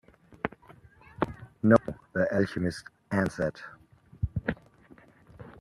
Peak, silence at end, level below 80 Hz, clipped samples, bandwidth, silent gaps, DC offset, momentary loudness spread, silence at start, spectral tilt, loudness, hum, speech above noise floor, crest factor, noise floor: -6 dBFS; 0.1 s; -52 dBFS; under 0.1%; 12 kHz; none; under 0.1%; 21 LU; 0.45 s; -7.5 dB/octave; -30 LUFS; none; 27 dB; 26 dB; -56 dBFS